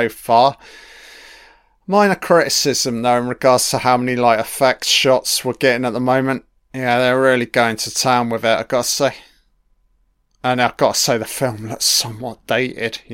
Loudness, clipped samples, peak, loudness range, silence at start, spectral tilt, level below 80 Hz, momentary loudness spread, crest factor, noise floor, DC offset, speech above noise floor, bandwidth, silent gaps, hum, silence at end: -16 LUFS; under 0.1%; 0 dBFS; 4 LU; 0 s; -3 dB/octave; -54 dBFS; 8 LU; 18 dB; -61 dBFS; under 0.1%; 44 dB; 16.5 kHz; none; none; 0 s